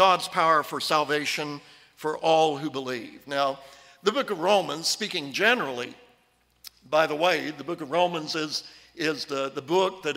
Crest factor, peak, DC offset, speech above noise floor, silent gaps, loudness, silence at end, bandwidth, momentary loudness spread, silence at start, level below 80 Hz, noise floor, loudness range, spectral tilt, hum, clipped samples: 20 dB; -6 dBFS; under 0.1%; 40 dB; none; -26 LUFS; 0 s; 16 kHz; 12 LU; 0 s; -72 dBFS; -65 dBFS; 2 LU; -3 dB/octave; none; under 0.1%